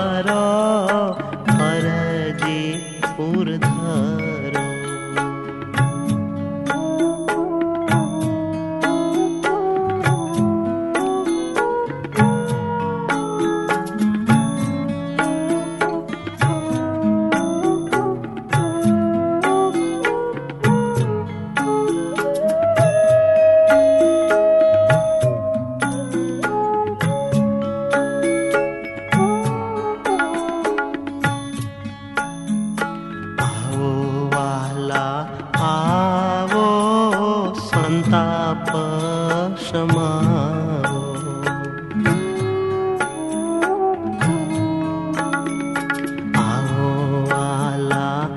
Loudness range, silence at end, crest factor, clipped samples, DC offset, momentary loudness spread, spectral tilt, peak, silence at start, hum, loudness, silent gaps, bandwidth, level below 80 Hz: 6 LU; 0 s; 16 dB; under 0.1%; under 0.1%; 8 LU; -6 dB/octave; -2 dBFS; 0 s; none; -20 LUFS; none; 11.5 kHz; -50 dBFS